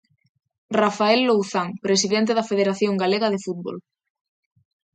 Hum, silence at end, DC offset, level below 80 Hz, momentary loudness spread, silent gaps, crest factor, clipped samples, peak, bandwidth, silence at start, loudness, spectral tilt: none; 1.15 s; under 0.1%; -70 dBFS; 11 LU; none; 18 dB; under 0.1%; -4 dBFS; 9.4 kHz; 0.7 s; -21 LUFS; -4 dB/octave